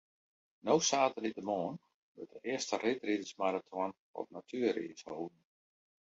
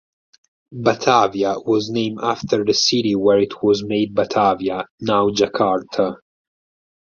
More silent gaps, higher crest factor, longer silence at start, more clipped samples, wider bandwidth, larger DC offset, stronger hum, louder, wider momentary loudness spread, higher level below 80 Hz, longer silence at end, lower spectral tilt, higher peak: first, 1.94-2.15 s, 3.98-4.14 s vs 4.91-4.98 s; about the same, 22 dB vs 18 dB; about the same, 0.65 s vs 0.7 s; neither; about the same, 7.6 kHz vs 7.4 kHz; neither; neither; second, -36 LUFS vs -18 LUFS; first, 15 LU vs 7 LU; second, -82 dBFS vs -56 dBFS; about the same, 0.85 s vs 0.95 s; second, -3 dB/octave vs -4.5 dB/octave; second, -16 dBFS vs -2 dBFS